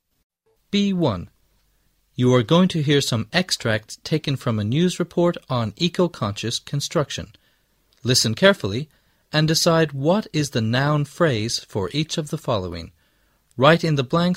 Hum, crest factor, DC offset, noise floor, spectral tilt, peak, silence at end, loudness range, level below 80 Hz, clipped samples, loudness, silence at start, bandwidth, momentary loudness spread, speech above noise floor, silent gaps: none; 20 dB; under 0.1%; -64 dBFS; -5 dB/octave; 0 dBFS; 0 s; 3 LU; -52 dBFS; under 0.1%; -21 LUFS; 0.75 s; 16 kHz; 10 LU; 44 dB; none